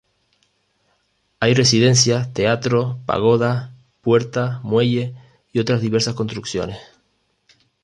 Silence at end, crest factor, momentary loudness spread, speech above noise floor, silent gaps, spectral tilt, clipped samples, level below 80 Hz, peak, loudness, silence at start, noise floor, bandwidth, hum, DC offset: 1 s; 18 dB; 13 LU; 48 dB; none; -4.5 dB/octave; under 0.1%; -52 dBFS; -2 dBFS; -18 LUFS; 1.4 s; -66 dBFS; 11 kHz; 50 Hz at -55 dBFS; under 0.1%